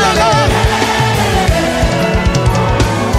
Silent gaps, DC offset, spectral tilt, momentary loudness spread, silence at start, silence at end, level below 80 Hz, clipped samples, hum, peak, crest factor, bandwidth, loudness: none; under 0.1%; -5 dB/octave; 3 LU; 0 s; 0 s; -20 dBFS; under 0.1%; none; 0 dBFS; 12 dB; 16 kHz; -12 LUFS